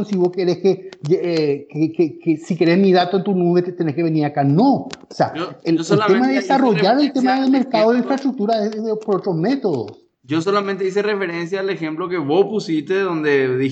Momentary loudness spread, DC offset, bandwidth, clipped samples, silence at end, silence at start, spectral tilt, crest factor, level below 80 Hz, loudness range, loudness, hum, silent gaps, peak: 8 LU; under 0.1%; 8.2 kHz; under 0.1%; 0 s; 0 s; -7 dB/octave; 16 dB; -72 dBFS; 4 LU; -18 LUFS; none; none; -2 dBFS